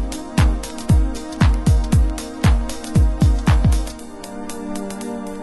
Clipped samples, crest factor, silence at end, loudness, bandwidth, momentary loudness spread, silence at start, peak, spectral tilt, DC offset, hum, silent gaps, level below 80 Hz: under 0.1%; 14 dB; 0 s; -19 LUFS; 12.5 kHz; 13 LU; 0 s; -2 dBFS; -6.5 dB/octave; under 0.1%; none; none; -20 dBFS